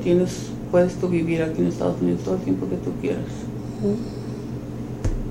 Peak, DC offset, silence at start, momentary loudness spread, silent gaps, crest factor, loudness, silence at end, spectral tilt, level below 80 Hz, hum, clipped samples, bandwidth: -6 dBFS; under 0.1%; 0 s; 11 LU; none; 18 dB; -24 LUFS; 0 s; -7.5 dB/octave; -38 dBFS; none; under 0.1%; 16 kHz